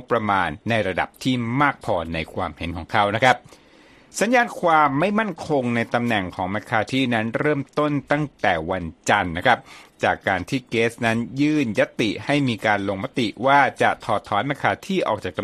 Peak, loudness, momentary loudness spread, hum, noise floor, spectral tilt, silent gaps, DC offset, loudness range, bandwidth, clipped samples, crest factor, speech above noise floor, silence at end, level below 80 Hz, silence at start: 0 dBFS; -21 LUFS; 7 LU; none; -51 dBFS; -5.5 dB/octave; none; under 0.1%; 2 LU; 14 kHz; under 0.1%; 22 dB; 29 dB; 0 s; -50 dBFS; 0 s